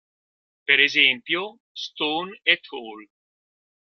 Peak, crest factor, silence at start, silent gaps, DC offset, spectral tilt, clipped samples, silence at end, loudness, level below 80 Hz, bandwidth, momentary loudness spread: -2 dBFS; 24 dB; 0.7 s; 1.60-1.75 s; under 0.1%; -2.5 dB/octave; under 0.1%; 0.8 s; -20 LUFS; -76 dBFS; 14 kHz; 19 LU